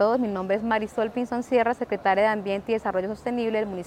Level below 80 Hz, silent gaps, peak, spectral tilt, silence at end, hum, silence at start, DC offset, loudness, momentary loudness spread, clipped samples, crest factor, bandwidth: -56 dBFS; none; -8 dBFS; -6 dB/octave; 0 s; none; 0 s; under 0.1%; -25 LUFS; 6 LU; under 0.1%; 16 dB; 13 kHz